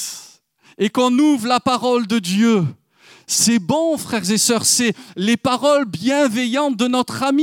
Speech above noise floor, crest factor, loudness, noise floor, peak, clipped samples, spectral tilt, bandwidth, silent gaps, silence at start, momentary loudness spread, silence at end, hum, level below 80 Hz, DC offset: 33 dB; 16 dB; -17 LUFS; -50 dBFS; -2 dBFS; under 0.1%; -3.5 dB/octave; 17.5 kHz; none; 0 s; 6 LU; 0 s; none; -64 dBFS; under 0.1%